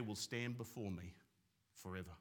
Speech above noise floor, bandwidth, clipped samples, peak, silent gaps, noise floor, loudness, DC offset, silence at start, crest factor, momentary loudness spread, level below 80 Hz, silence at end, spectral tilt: 33 dB; 18 kHz; under 0.1%; -28 dBFS; none; -80 dBFS; -47 LUFS; under 0.1%; 0 s; 20 dB; 14 LU; -76 dBFS; 0 s; -4.5 dB/octave